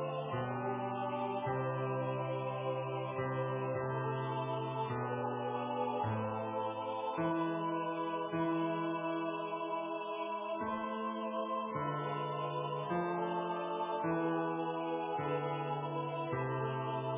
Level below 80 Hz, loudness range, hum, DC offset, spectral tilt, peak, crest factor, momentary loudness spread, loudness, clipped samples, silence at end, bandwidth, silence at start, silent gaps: -72 dBFS; 1 LU; none; under 0.1%; -5.5 dB/octave; -22 dBFS; 14 dB; 3 LU; -37 LUFS; under 0.1%; 0 s; 3.8 kHz; 0 s; none